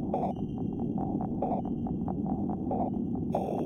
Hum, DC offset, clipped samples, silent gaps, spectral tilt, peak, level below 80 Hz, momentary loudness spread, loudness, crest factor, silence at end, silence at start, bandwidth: none; under 0.1%; under 0.1%; none; -11 dB/octave; -16 dBFS; -50 dBFS; 2 LU; -32 LUFS; 16 dB; 0 s; 0 s; 6.8 kHz